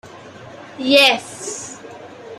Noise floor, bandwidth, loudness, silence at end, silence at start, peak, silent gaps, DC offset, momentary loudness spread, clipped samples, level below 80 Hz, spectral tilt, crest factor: -38 dBFS; 14.5 kHz; -15 LUFS; 0.05 s; 0.05 s; 0 dBFS; none; under 0.1%; 26 LU; under 0.1%; -66 dBFS; -1.5 dB/octave; 20 dB